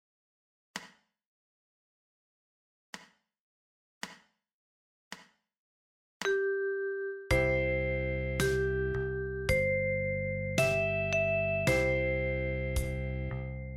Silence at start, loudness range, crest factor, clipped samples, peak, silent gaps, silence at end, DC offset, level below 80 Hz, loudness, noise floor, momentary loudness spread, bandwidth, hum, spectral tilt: 0.75 s; 23 LU; 22 dB; under 0.1%; -12 dBFS; 1.26-2.93 s, 3.40-4.01 s, 4.53-5.11 s, 5.58-6.20 s; 0 s; under 0.1%; -44 dBFS; -31 LUFS; -58 dBFS; 17 LU; 16 kHz; none; -5.5 dB/octave